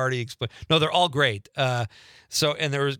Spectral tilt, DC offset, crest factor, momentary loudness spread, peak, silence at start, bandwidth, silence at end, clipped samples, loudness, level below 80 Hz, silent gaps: -4 dB/octave; under 0.1%; 18 dB; 11 LU; -6 dBFS; 0 s; 19 kHz; 0 s; under 0.1%; -24 LUFS; -60 dBFS; none